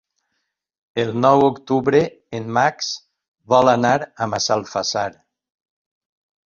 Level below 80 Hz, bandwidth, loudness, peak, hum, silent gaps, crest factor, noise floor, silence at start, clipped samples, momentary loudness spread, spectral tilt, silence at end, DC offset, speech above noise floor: -58 dBFS; 7.4 kHz; -19 LUFS; -2 dBFS; none; 3.28-3.34 s; 18 dB; -75 dBFS; 0.95 s; under 0.1%; 12 LU; -4.5 dB/octave; 1.35 s; under 0.1%; 57 dB